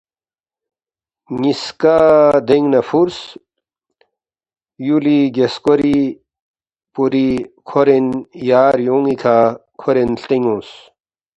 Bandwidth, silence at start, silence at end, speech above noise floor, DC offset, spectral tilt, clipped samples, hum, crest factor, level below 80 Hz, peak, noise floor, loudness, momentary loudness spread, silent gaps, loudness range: 8.2 kHz; 1.3 s; 0.65 s; over 76 dB; under 0.1%; -7 dB/octave; under 0.1%; none; 16 dB; -52 dBFS; 0 dBFS; under -90 dBFS; -15 LUFS; 11 LU; 6.40-6.54 s; 3 LU